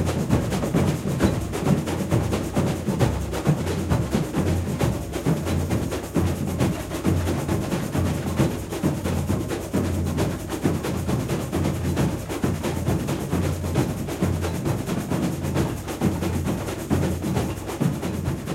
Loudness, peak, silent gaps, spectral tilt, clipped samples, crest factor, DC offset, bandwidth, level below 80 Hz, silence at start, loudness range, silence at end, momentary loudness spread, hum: -25 LUFS; -6 dBFS; none; -6.5 dB/octave; under 0.1%; 18 dB; under 0.1%; 16 kHz; -36 dBFS; 0 s; 2 LU; 0 s; 3 LU; none